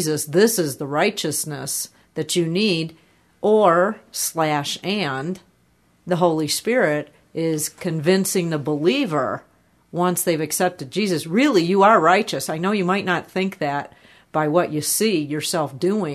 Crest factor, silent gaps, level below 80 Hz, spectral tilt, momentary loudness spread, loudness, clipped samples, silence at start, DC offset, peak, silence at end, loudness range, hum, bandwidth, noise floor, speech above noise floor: 18 dB; none; -66 dBFS; -4 dB/octave; 10 LU; -20 LUFS; under 0.1%; 0 s; under 0.1%; -2 dBFS; 0 s; 4 LU; none; 13.5 kHz; -60 dBFS; 40 dB